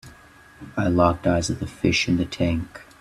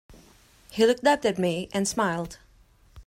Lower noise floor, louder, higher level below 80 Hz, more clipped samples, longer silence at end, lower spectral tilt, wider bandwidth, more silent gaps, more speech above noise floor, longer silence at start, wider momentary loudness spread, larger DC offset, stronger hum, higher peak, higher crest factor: second, -49 dBFS vs -58 dBFS; about the same, -23 LUFS vs -25 LUFS; first, -44 dBFS vs -56 dBFS; neither; first, 0.2 s vs 0.05 s; about the same, -5.5 dB/octave vs -4.5 dB/octave; second, 13 kHz vs 16 kHz; neither; second, 27 dB vs 34 dB; about the same, 0.05 s vs 0.1 s; second, 9 LU vs 13 LU; neither; neither; first, -2 dBFS vs -8 dBFS; about the same, 20 dB vs 18 dB